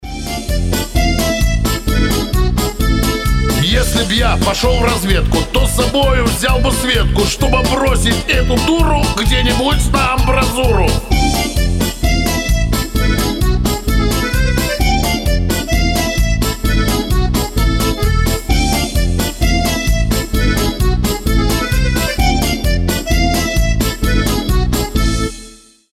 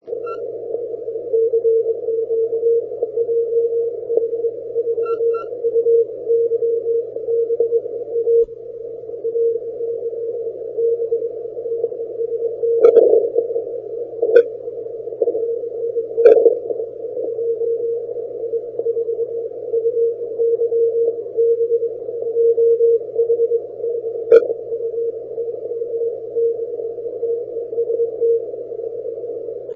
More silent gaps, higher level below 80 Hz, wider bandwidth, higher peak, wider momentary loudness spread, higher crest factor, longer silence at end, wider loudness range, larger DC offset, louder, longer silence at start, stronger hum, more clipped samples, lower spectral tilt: neither; first, -16 dBFS vs -64 dBFS; first, 16 kHz vs 3.6 kHz; about the same, -2 dBFS vs 0 dBFS; second, 3 LU vs 12 LU; second, 12 dB vs 18 dB; first, 0.35 s vs 0 s; second, 2 LU vs 6 LU; neither; first, -15 LUFS vs -19 LUFS; about the same, 0 s vs 0.05 s; second, none vs 60 Hz at -55 dBFS; neither; second, -4.5 dB/octave vs -8 dB/octave